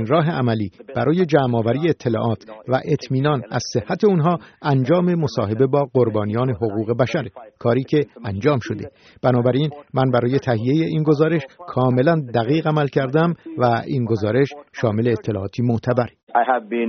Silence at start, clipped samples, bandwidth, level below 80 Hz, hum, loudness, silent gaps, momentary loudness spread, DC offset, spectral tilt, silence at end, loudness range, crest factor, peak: 0 s; under 0.1%; 6.6 kHz; -56 dBFS; none; -20 LUFS; 16.23-16.27 s; 6 LU; under 0.1%; -7 dB/octave; 0 s; 2 LU; 18 dB; -2 dBFS